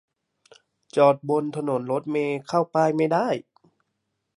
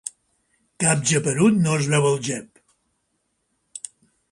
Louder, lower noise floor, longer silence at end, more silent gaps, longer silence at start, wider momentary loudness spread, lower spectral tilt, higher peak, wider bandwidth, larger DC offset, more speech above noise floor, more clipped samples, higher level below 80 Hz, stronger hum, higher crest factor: second, -23 LUFS vs -20 LUFS; first, -78 dBFS vs -72 dBFS; first, 1 s vs 0.55 s; neither; first, 0.95 s vs 0.05 s; second, 8 LU vs 18 LU; first, -7 dB/octave vs -4.5 dB/octave; about the same, -6 dBFS vs -6 dBFS; about the same, 11.5 kHz vs 11.5 kHz; neither; about the same, 55 dB vs 53 dB; neither; second, -76 dBFS vs -60 dBFS; neither; about the same, 20 dB vs 18 dB